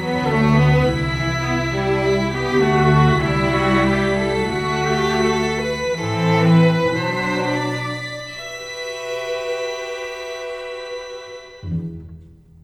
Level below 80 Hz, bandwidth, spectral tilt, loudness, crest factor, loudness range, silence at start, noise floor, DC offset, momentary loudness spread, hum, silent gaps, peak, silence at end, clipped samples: -36 dBFS; 12.5 kHz; -6 dB/octave; -19 LUFS; 16 dB; 10 LU; 0 s; -43 dBFS; under 0.1%; 15 LU; none; none; -4 dBFS; 0.35 s; under 0.1%